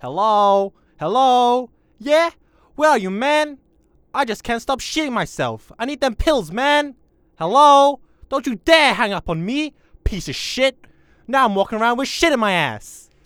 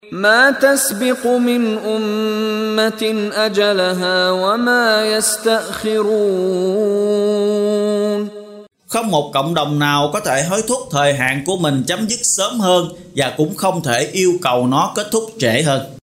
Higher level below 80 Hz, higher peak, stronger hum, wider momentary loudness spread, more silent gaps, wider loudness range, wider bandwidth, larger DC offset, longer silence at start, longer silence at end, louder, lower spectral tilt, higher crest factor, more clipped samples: first, -38 dBFS vs -56 dBFS; about the same, 0 dBFS vs 0 dBFS; neither; first, 14 LU vs 5 LU; neither; first, 5 LU vs 2 LU; first, 18.5 kHz vs 16 kHz; neither; about the same, 0.05 s vs 0.05 s; first, 0.25 s vs 0.05 s; about the same, -18 LUFS vs -16 LUFS; about the same, -4 dB/octave vs -3.5 dB/octave; about the same, 18 dB vs 16 dB; neither